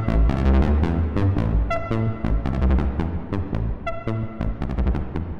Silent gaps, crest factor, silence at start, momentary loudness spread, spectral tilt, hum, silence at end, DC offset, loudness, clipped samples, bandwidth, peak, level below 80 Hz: none; 12 dB; 0 s; 9 LU; -9.5 dB/octave; none; 0 s; under 0.1%; -23 LUFS; under 0.1%; 6 kHz; -8 dBFS; -24 dBFS